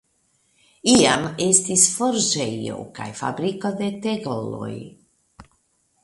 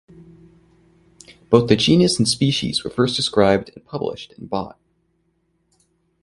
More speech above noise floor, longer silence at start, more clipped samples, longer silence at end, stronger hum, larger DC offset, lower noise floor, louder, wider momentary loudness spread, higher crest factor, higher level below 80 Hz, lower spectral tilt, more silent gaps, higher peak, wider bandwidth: about the same, 45 dB vs 48 dB; second, 0.85 s vs 1.5 s; neither; second, 0.6 s vs 1.55 s; neither; neither; about the same, -66 dBFS vs -67 dBFS; about the same, -20 LUFS vs -18 LUFS; first, 16 LU vs 13 LU; about the same, 22 dB vs 22 dB; second, -58 dBFS vs -50 dBFS; second, -3 dB/octave vs -5 dB/octave; neither; about the same, 0 dBFS vs 0 dBFS; about the same, 11.5 kHz vs 11.5 kHz